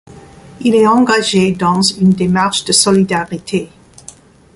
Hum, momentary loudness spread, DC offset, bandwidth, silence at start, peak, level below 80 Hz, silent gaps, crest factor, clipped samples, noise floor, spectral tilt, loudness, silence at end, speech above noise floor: none; 10 LU; under 0.1%; 11.5 kHz; 0.1 s; 0 dBFS; -46 dBFS; none; 14 dB; under 0.1%; -40 dBFS; -4 dB/octave; -12 LUFS; 0.9 s; 28 dB